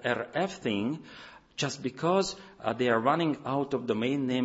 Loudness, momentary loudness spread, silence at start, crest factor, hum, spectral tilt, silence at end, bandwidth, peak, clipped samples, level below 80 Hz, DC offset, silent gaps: -30 LUFS; 10 LU; 0 s; 18 dB; none; -5 dB/octave; 0 s; 8 kHz; -12 dBFS; under 0.1%; -66 dBFS; under 0.1%; none